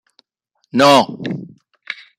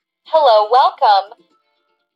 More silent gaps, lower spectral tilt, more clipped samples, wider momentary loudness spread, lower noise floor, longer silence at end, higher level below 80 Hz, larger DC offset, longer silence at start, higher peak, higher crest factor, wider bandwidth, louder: neither; first, -4.5 dB/octave vs -0.5 dB/octave; neither; first, 20 LU vs 5 LU; about the same, -68 dBFS vs -66 dBFS; second, 0.25 s vs 0.9 s; first, -60 dBFS vs -78 dBFS; neither; first, 0.75 s vs 0.3 s; about the same, -2 dBFS vs -2 dBFS; about the same, 16 dB vs 12 dB; first, 16 kHz vs 7.2 kHz; about the same, -14 LUFS vs -13 LUFS